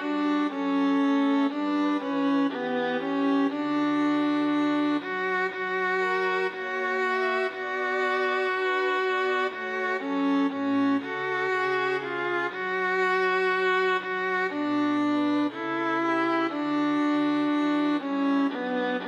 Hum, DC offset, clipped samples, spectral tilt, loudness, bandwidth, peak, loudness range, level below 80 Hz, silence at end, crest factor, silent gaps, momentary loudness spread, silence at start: none; under 0.1%; under 0.1%; -5.5 dB/octave; -26 LUFS; 7.6 kHz; -14 dBFS; 1 LU; -78 dBFS; 0 s; 10 dB; none; 4 LU; 0 s